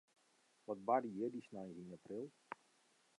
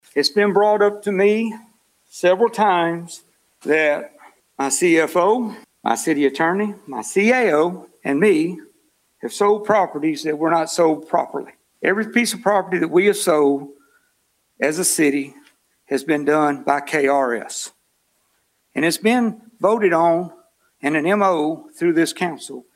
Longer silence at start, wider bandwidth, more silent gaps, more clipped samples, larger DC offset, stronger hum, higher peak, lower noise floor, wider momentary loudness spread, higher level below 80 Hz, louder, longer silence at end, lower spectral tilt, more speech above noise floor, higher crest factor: first, 0.7 s vs 0.15 s; second, 11 kHz vs 16 kHz; neither; neither; neither; neither; second, -22 dBFS vs -2 dBFS; first, -76 dBFS vs -66 dBFS; first, 18 LU vs 13 LU; second, -88 dBFS vs -70 dBFS; second, -44 LUFS vs -19 LUFS; first, 0.65 s vs 0.15 s; first, -7.5 dB/octave vs -4 dB/octave; second, 32 dB vs 48 dB; first, 24 dB vs 18 dB